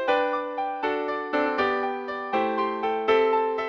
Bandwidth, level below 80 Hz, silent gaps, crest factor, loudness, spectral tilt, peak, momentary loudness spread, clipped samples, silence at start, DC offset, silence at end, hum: 6.6 kHz; -64 dBFS; none; 16 dB; -25 LUFS; -5.5 dB/octave; -10 dBFS; 7 LU; under 0.1%; 0 s; under 0.1%; 0 s; none